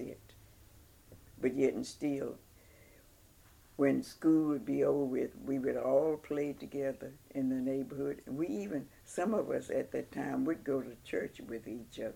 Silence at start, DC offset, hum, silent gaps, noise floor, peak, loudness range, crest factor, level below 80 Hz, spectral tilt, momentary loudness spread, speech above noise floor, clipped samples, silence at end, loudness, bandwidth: 0 s; under 0.1%; none; none; -62 dBFS; -16 dBFS; 5 LU; 18 dB; -66 dBFS; -6.5 dB/octave; 13 LU; 27 dB; under 0.1%; 0 s; -35 LUFS; 17 kHz